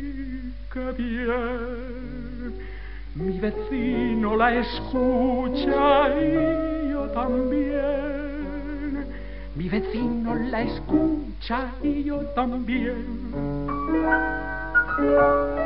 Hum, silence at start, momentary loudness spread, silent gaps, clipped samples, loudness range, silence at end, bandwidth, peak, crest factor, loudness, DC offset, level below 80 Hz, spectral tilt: none; 0 s; 14 LU; none; under 0.1%; 6 LU; 0 s; 5.6 kHz; -8 dBFS; 18 dB; -25 LUFS; 1%; -36 dBFS; -5 dB/octave